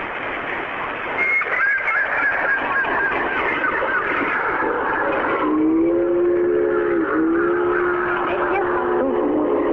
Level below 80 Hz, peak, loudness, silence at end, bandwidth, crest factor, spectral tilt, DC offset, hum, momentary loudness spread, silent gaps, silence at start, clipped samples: -48 dBFS; -8 dBFS; -19 LUFS; 0 s; 5.2 kHz; 12 dB; -7.5 dB/octave; under 0.1%; none; 3 LU; none; 0 s; under 0.1%